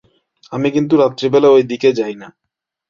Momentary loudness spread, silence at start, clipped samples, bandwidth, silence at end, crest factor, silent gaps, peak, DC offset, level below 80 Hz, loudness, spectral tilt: 14 LU; 0.5 s; under 0.1%; 7.2 kHz; 0.6 s; 14 dB; none; -2 dBFS; under 0.1%; -58 dBFS; -14 LUFS; -6.5 dB/octave